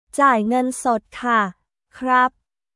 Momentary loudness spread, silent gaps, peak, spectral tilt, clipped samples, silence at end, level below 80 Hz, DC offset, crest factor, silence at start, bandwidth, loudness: 7 LU; none; -2 dBFS; -4 dB/octave; under 0.1%; 0.45 s; -60 dBFS; under 0.1%; 18 dB; 0.15 s; 12 kHz; -19 LUFS